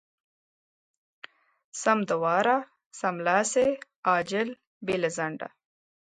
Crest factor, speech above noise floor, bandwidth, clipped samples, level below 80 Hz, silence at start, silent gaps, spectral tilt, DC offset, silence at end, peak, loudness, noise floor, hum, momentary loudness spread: 20 dB; over 64 dB; 10.5 kHz; under 0.1%; -70 dBFS; 1.75 s; 2.86-2.91 s, 3.96-4.03 s, 4.67-4.81 s; -4 dB/octave; under 0.1%; 0.55 s; -8 dBFS; -27 LUFS; under -90 dBFS; none; 14 LU